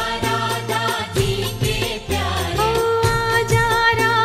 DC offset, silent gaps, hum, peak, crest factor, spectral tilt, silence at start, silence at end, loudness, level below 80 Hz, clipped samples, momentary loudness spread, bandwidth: under 0.1%; none; none; -4 dBFS; 16 dB; -4 dB/octave; 0 s; 0 s; -19 LUFS; -34 dBFS; under 0.1%; 6 LU; 16 kHz